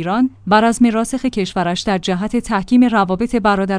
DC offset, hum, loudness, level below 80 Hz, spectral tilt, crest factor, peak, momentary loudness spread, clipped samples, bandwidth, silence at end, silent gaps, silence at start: under 0.1%; none; -16 LUFS; -40 dBFS; -5.5 dB/octave; 16 dB; 0 dBFS; 6 LU; under 0.1%; 10.5 kHz; 0 s; none; 0 s